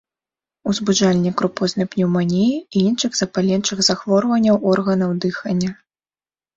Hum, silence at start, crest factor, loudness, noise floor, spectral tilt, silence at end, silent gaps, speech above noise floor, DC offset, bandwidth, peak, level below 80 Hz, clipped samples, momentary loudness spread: none; 0.65 s; 16 dB; -18 LUFS; under -90 dBFS; -5 dB/octave; 0.85 s; none; over 72 dB; under 0.1%; 7.8 kHz; -4 dBFS; -56 dBFS; under 0.1%; 6 LU